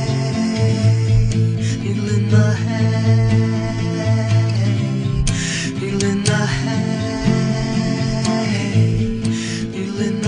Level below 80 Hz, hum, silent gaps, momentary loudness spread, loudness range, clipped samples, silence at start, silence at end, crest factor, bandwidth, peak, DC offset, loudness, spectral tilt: -32 dBFS; none; none; 6 LU; 2 LU; under 0.1%; 0 s; 0 s; 14 dB; 10.5 kHz; -2 dBFS; under 0.1%; -18 LUFS; -6 dB/octave